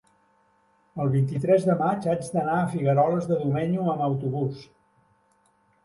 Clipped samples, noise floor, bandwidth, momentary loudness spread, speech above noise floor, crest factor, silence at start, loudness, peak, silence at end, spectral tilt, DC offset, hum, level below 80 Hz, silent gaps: under 0.1%; -65 dBFS; 11.5 kHz; 8 LU; 41 dB; 16 dB; 0.95 s; -25 LUFS; -8 dBFS; 1.2 s; -8.5 dB/octave; under 0.1%; none; -62 dBFS; none